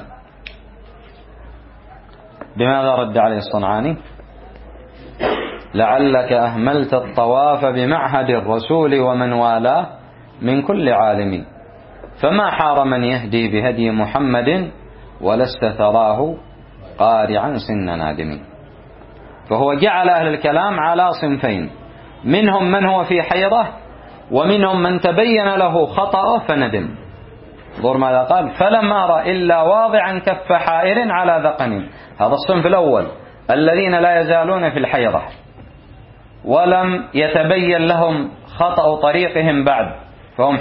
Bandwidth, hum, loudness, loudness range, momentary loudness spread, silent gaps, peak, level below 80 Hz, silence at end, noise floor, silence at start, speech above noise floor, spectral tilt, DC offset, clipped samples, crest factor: 5.6 kHz; none; -16 LUFS; 4 LU; 10 LU; none; -2 dBFS; -44 dBFS; 0 s; -41 dBFS; 0 s; 26 dB; -11.5 dB/octave; under 0.1%; under 0.1%; 16 dB